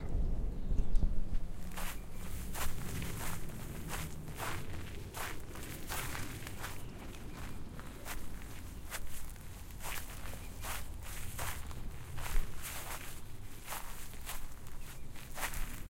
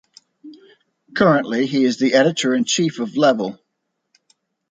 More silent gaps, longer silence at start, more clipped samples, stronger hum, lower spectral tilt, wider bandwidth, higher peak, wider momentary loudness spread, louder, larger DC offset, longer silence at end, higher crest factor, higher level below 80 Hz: neither; second, 0 s vs 0.45 s; neither; neither; about the same, -4 dB/octave vs -4.5 dB/octave; first, 17 kHz vs 9.6 kHz; second, -16 dBFS vs -2 dBFS; about the same, 9 LU vs 7 LU; second, -44 LUFS vs -18 LUFS; neither; second, 0.05 s vs 1.15 s; about the same, 20 dB vs 18 dB; first, -40 dBFS vs -62 dBFS